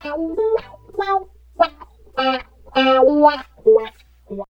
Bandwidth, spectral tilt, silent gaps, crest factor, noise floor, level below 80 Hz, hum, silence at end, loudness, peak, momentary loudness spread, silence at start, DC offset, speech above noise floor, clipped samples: 6.4 kHz; -5.5 dB/octave; none; 18 dB; -42 dBFS; -48 dBFS; none; 0.1 s; -18 LUFS; 0 dBFS; 16 LU; 0.05 s; under 0.1%; 27 dB; under 0.1%